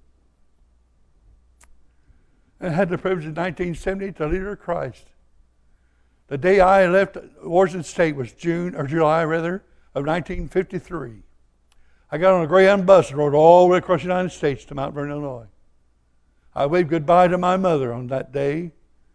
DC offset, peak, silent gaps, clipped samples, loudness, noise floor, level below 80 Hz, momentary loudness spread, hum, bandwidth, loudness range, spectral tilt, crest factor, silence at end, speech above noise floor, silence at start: under 0.1%; 0 dBFS; none; under 0.1%; -20 LUFS; -60 dBFS; -44 dBFS; 16 LU; none; 11 kHz; 11 LU; -7 dB/octave; 20 dB; 0.45 s; 41 dB; 2.6 s